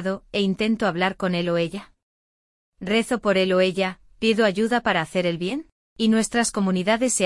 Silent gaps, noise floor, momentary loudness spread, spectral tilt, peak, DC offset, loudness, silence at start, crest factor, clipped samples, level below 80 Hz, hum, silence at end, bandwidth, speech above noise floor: 2.03-2.72 s, 5.72-5.96 s; under -90 dBFS; 8 LU; -4.5 dB/octave; -6 dBFS; under 0.1%; -22 LUFS; 0 s; 16 dB; under 0.1%; -54 dBFS; none; 0 s; 12 kHz; over 68 dB